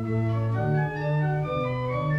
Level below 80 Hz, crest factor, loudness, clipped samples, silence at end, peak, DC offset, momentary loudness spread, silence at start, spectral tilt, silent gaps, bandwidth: -50 dBFS; 10 dB; -26 LUFS; under 0.1%; 0 s; -14 dBFS; under 0.1%; 2 LU; 0 s; -9.5 dB/octave; none; 5.6 kHz